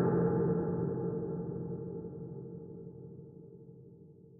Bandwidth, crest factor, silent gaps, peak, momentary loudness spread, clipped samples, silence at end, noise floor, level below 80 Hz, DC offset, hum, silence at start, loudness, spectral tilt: 2.1 kHz; 16 dB; none; -20 dBFS; 23 LU; under 0.1%; 0 s; -56 dBFS; -62 dBFS; under 0.1%; none; 0 s; -36 LUFS; -8.5 dB/octave